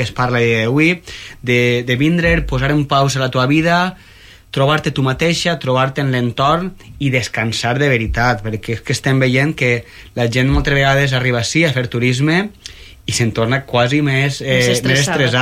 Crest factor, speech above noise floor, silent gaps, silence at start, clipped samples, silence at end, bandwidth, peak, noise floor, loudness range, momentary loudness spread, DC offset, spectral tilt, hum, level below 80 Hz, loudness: 12 dB; 21 dB; none; 0 s; under 0.1%; 0 s; 15 kHz; -4 dBFS; -36 dBFS; 2 LU; 8 LU; under 0.1%; -5 dB/octave; none; -32 dBFS; -15 LUFS